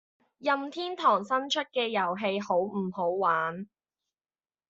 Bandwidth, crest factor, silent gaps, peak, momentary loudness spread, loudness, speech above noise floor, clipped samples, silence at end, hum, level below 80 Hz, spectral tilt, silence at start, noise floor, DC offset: 7.8 kHz; 20 dB; none; -10 dBFS; 9 LU; -29 LUFS; over 61 dB; under 0.1%; 1.05 s; none; -76 dBFS; -2.5 dB/octave; 0.4 s; under -90 dBFS; under 0.1%